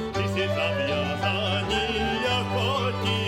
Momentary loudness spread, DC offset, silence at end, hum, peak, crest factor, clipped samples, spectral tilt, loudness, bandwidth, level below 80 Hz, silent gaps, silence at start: 1 LU; under 0.1%; 0 s; none; -12 dBFS; 14 dB; under 0.1%; -5 dB/octave; -25 LUFS; 15.5 kHz; -44 dBFS; none; 0 s